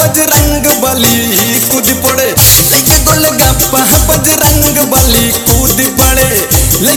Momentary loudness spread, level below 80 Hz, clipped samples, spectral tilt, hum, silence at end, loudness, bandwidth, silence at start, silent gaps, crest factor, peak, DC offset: 4 LU; -18 dBFS; 2%; -3 dB/octave; none; 0 s; -6 LUFS; over 20 kHz; 0 s; none; 8 dB; 0 dBFS; under 0.1%